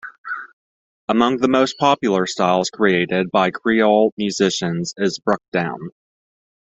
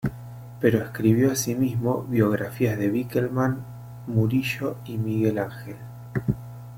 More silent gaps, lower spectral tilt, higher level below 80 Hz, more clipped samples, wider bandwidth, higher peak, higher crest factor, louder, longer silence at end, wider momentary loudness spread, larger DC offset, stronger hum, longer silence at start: first, 0.18-0.24 s, 0.53-1.08 s, 4.12-4.17 s, 5.48-5.52 s vs none; second, -5 dB/octave vs -6.5 dB/octave; second, -58 dBFS vs -52 dBFS; neither; second, 8.2 kHz vs 16.5 kHz; first, -2 dBFS vs -6 dBFS; about the same, 18 dB vs 20 dB; first, -18 LUFS vs -25 LUFS; first, 0.85 s vs 0 s; about the same, 14 LU vs 15 LU; neither; neither; about the same, 0.05 s vs 0 s